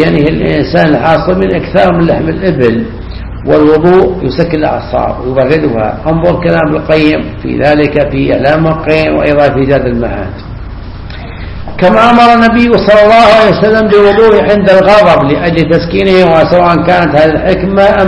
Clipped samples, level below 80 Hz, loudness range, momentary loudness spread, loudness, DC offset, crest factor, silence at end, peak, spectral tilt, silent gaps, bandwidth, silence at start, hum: 3%; -26 dBFS; 5 LU; 13 LU; -7 LUFS; 0.3%; 8 dB; 0 s; 0 dBFS; -7.5 dB/octave; none; 11 kHz; 0 s; none